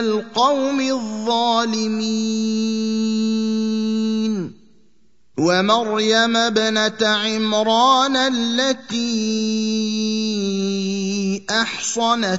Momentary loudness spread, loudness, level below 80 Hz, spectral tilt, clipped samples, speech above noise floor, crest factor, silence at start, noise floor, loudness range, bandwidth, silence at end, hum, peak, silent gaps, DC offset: 6 LU; -19 LUFS; -64 dBFS; -3.5 dB/octave; under 0.1%; 43 dB; 18 dB; 0 s; -62 dBFS; 4 LU; 8 kHz; 0 s; none; -2 dBFS; none; 0.3%